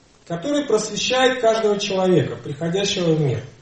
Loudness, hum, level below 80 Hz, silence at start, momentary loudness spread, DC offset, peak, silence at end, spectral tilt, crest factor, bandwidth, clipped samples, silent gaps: -20 LUFS; none; -56 dBFS; 0.3 s; 9 LU; 0.1%; -4 dBFS; 0.1 s; -4.5 dB/octave; 16 dB; 8.8 kHz; under 0.1%; none